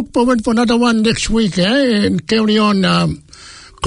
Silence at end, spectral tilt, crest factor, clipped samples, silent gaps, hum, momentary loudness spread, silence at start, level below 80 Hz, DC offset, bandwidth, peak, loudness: 0 s; -5 dB/octave; 12 dB; under 0.1%; none; none; 3 LU; 0 s; -36 dBFS; under 0.1%; 11 kHz; -2 dBFS; -14 LUFS